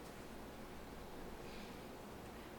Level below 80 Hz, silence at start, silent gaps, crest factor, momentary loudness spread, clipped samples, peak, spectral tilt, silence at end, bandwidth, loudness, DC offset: -60 dBFS; 0 s; none; 14 dB; 1 LU; under 0.1%; -38 dBFS; -5 dB/octave; 0 s; 19 kHz; -53 LUFS; under 0.1%